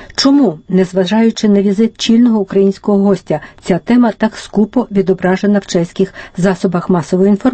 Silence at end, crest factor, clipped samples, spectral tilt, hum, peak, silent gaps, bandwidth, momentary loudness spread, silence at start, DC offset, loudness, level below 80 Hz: 0 s; 12 dB; under 0.1%; -6.5 dB/octave; none; 0 dBFS; none; 8.8 kHz; 7 LU; 0 s; under 0.1%; -13 LUFS; -46 dBFS